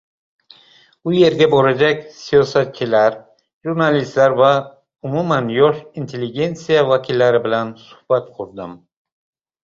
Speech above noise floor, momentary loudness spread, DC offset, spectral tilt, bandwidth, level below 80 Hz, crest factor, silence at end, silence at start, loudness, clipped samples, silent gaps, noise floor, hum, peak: 35 dB; 16 LU; under 0.1%; -6.5 dB/octave; 7.6 kHz; -56 dBFS; 16 dB; 0.85 s; 1.05 s; -16 LUFS; under 0.1%; 3.53-3.61 s; -51 dBFS; none; -2 dBFS